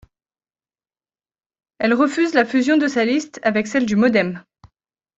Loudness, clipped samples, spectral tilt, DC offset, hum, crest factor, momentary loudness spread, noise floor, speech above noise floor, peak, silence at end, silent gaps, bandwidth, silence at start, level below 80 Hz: -18 LUFS; under 0.1%; -5 dB/octave; under 0.1%; none; 18 dB; 5 LU; under -90 dBFS; over 73 dB; -2 dBFS; 0.8 s; none; 8 kHz; 1.8 s; -60 dBFS